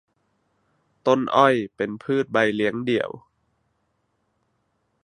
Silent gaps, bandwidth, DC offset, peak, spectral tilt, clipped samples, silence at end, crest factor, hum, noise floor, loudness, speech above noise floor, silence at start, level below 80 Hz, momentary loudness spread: none; 11 kHz; under 0.1%; -2 dBFS; -6 dB/octave; under 0.1%; 1.85 s; 24 dB; none; -72 dBFS; -22 LUFS; 50 dB; 1.05 s; -66 dBFS; 11 LU